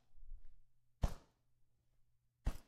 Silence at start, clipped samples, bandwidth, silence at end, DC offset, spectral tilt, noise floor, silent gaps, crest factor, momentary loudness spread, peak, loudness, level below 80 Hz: 0.1 s; under 0.1%; 14.5 kHz; 0.05 s; under 0.1%; -6 dB/octave; -74 dBFS; none; 24 dB; 18 LU; -22 dBFS; -47 LUFS; -50 dBFS